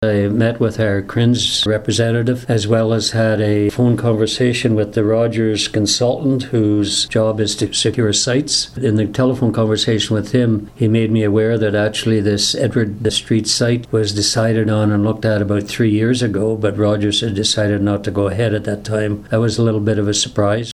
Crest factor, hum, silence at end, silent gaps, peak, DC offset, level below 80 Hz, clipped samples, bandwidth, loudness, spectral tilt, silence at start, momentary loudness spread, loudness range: 14 dB; none; 0 s; none; -2 dBFS; under 0.1%; -44 dBFS; under 0.1%; 12.5 kHz; -16 LUFS; -5 dB/octave; 0 s; 3 LU; 1 LU